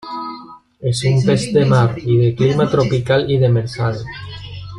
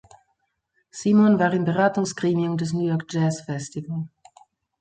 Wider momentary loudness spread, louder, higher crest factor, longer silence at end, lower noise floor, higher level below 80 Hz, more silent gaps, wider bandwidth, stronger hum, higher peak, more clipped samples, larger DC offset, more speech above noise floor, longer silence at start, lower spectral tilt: about the same, 16 LU vs 14 LU; first, -16 LUFS vs -23 LUFS; about the same, 14 dB vs 18 dB; second, 0 s vs 0.75 s; second, -38 dBFS vs -73 dBFS; first, -44 dBFS vs -64 dBFS; neither; first, 11 kHz vs 9.2 kHz; neither; first, -2 dBFS vs -6 dBFS; neither; neither; second, 23 dB vs 51 dB; second, 0.05 s vs 0.95 s; about the same, -7 dB/octave vs -6.5 dB/octave